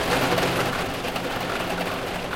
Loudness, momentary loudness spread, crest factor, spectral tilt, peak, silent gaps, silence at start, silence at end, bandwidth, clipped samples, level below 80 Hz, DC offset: -25 LUFS; 6 LU; 16 dB; -4 dB/octave; -10 dBFS; none; 0 s; 0 s; 17 kHz; under 0.1%; -44 dBFS; under 0.1%